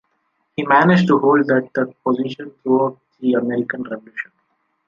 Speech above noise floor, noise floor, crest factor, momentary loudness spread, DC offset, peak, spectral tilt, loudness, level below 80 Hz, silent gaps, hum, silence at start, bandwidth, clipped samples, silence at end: 51 dB; -68 dBFS; 16 dB; 15 LU; under 0.1%; -2 dBFS; -8 dB/octave; -18 LUFS; -62 dBFS; none; none; 0.6 s; 7.4 kHz; under 0.1%; 0.65 s